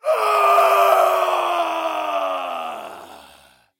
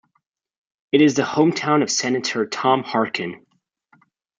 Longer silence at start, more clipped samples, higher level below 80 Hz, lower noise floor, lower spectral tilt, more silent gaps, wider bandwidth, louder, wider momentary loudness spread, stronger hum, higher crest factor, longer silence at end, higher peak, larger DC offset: second, 0.05 s vs 0.95 s; neither; about the same, -72 dBFS vs -68 dBFS; second, -51 dBFS vs -71 dBFS; second, -1 dB/octave vs -4 dB/octave; neither; first, 16.5 kHz vs 9.4 kHz; about the same, -18 LUFS vs -19 LUFS; first, 17 LU vs 7 LU; neither; about the same, 16 dB vs 18 dB; second, 0.6 s vs 1.05 s; about the same, -4 dBFS vs -4 dBFS; neither